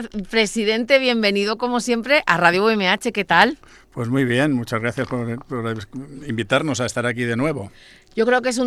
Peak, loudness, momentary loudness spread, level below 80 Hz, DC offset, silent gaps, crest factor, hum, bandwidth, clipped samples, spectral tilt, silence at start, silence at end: 0 dBFS; -19 LUFS; 14 LU; -52 dBFS; under 0.1%; none; 20 dB; none; 14 kHz; under 0.1%; -4.5 dB/octave; 0 s; 0 s